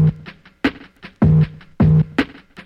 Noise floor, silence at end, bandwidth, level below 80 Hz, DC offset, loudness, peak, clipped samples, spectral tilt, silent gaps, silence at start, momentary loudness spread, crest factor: -41 dBFS; 0.4 s; 5.6 kHz; -34 dBFS; under 0.1%; -18 LUFS; -2 dBFS; under 0.1%; -9 dB/octave; none; 0 s; 9 LU; 16 dB